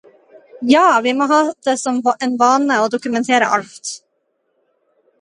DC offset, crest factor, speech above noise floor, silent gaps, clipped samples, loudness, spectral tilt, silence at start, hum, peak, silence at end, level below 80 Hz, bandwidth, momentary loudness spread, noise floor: under 0.1%; 16 dB; 52 dB; none; under 0.1%; -15 LUFS; -3 dB/octave; 0.55 s; none; 0 dBFS; 1.25 s; -68 dBFS; 11 kHz; 14 LU; -68 dBFS